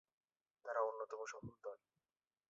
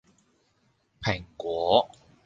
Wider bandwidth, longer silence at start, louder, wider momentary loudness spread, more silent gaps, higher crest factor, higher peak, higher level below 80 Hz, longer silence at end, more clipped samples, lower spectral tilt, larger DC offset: about the same, 7.6 kHz vs 7.6 kHz; second, 0.65 s vs 1 s; second, -46 LUFS vs -27 LUFS; first, 14 LU vs 10 LU; neither; about the same, 22 dB vs 24 dB; second, -26 dBFS vs -6 dBFS; second, -84 dBFS vs -56 dBFS; first, 0.75 s vs 0.4 s; neither; second, -4 dB/octave vs -5.5 dB/octave; neither